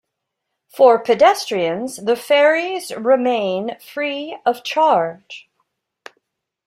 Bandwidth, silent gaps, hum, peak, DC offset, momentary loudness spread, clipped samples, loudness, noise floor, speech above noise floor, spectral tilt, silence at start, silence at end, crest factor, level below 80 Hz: 15.5 kHz; none; none; -2 dBFS; under 0.1%; 13 LU; under 0.1%; -17 LUFS; -78 dBFS; 61 dB; -4 dB/octave; 0.75 s; 1.25 s; 16 dB; -68 dBFS